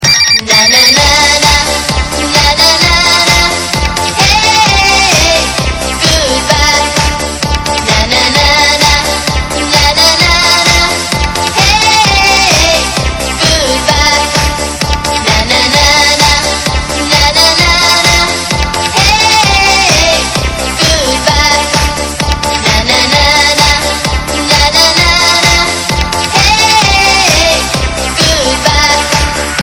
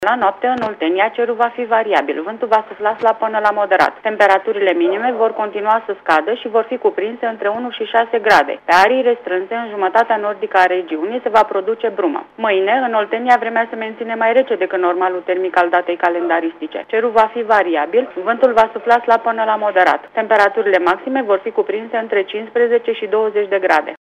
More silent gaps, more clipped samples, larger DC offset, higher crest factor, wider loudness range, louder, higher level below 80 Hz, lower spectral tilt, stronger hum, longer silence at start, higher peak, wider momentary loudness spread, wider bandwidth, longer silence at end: neither; first, 2% vs under 0.1%; neither; second, 8 dB vs 14 dB; about the same, 2 LU vs 2 LU; first, -7 LUFS vs -16 LUFS; first, -20 dBFS vs -60 dBFS; second, -2 dB/octave vs -4.5 dB/octave; neither; about the same, 0 s vs 0 s; about the same, 0 dBFS vs -2 dBFS; about the same, 7 LU vs 7 LU; first, over 20 kHz vs 13 kHz; about the same, 0 s vs 0.05 s